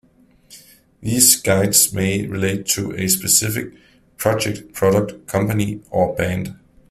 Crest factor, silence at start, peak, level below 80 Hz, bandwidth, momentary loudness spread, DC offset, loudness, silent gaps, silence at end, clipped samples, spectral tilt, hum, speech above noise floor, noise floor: 20 dB; 0.5 s; 0 dBFS; -48 dBFS; 16 kHz; 11 LU; under 0.1%; -17 LUFS; none; 0.35 s; under 0.1%; -3.5 dB/octave; none; 34 dB; -53 dBFS